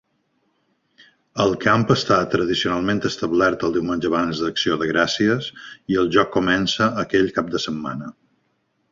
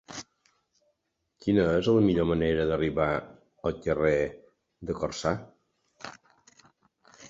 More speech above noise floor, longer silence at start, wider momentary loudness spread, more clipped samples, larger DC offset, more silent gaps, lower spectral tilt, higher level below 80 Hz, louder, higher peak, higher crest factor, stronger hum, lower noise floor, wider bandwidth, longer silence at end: second, 48 dB vs 53 dB; first, 1.35 s vs 0.1 s; second, 8 LU vs 19 LU; neither; neither; neither; second, -5 dB/octave vs -6.5 dB/octave; about the same, -50 dBFS vs -50 dBFS; first, -20 LUFS vs -27 LUFS; first, -2 dBFS vs -10 dBFS; about the same, 20 dB vs 20 dB; neither; second, -68 dBFS vs -79 dBFS; about the same, 7.6 kHz vs 7.8 kHz; first, 0.8 s vs 0 s